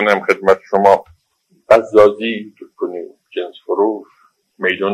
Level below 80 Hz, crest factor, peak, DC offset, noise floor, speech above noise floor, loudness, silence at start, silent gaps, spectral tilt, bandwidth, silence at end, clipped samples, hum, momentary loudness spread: -56 dBFS; 16 dB; 0 dBFS; under 0.1%; -60 dBFS; 47 dB; -15 LUFS; 0 s; none; -5.5 dB/octave; 13 kHz; 0 s; under 0.1%; none; 16 LU